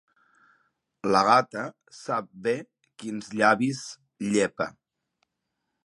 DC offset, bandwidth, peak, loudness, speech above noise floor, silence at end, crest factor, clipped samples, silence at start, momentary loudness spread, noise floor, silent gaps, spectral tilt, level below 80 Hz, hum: under 0.1%; 11.5 kHz; -4 dBFS; -26 LUFS; 56 dB; 1.15 s; 24 dB; under 0.1%; 1.05 s; 16 LU; -81 dBFS; none; -4.5 dB/octave; -70 dBFS; none